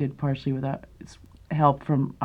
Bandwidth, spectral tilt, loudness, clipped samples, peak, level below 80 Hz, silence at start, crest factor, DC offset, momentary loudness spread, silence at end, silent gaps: 7.6 kHz; -9 dB/octave; -26 LUFS; under 0.1%; -6 dBFS; -52 dBFS; 0 s; 20 dB; under 0.1%; 18 LU; 0 s; none